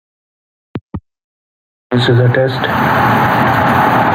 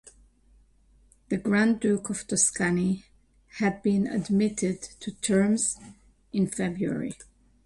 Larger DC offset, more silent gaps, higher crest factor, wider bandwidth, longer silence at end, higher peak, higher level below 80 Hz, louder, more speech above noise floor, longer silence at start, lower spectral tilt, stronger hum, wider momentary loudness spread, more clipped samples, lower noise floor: neither; first, 0.81-0.89 s, 1.24-1.90 s vs none; second, 12 dB vs 20 dB; first, 16.5 kHz vs 11.5 kHz; second, 0 s vs 0.4 s; first, -2 dBFS vs -8 dBFS; first, -44 dBFS vs -58 dBFS; first, -12 LUFS vs -26 LUFS; first, over 79 dB vs 34 dB; first, 0.75 s vs 0.05 s; first, -7 dB/octave vs -4.5 dB/octave; neither; first, 19 LU vs 12 LU; neither; first, under -90 dBFS vs -60 dBFS